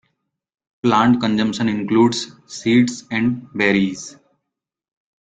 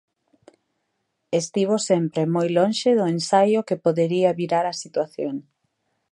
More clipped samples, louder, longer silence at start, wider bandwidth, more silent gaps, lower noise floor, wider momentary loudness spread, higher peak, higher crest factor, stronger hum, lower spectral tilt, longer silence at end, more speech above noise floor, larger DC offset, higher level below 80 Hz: neither; first, -18 LUFS vs -22 LUFS; second, 0.85 s vs 1.3 s; second, 9 kHz vs 11.5 kHz; neither; first, -80 dBFS vs -75 dBFS; about the same, 10 LU vs 8 LU; about the same, -2 dBFS vs -4 dBFS; about the same, 18 dB vs 18 dB; neither; about the same, -5 dB/octave vs -5.5 dB/octave; first, 1.2 s vs 0.7 s; first, 63 dB vs 54 dB; neither; first, -56 dBFS vs -72 dBFS